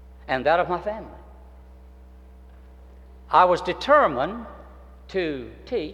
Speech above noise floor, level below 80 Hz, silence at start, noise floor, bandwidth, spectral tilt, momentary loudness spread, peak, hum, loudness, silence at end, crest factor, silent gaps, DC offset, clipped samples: 24 dB; -46 dBFS; 0 s; -46 dBFS; 10.5 kHz; -5.5 dB/octave; 18 LU; -4 dBFS; none; -22 LUFS; 0 s; 22 dB; none; under 0.1%; under 0.1%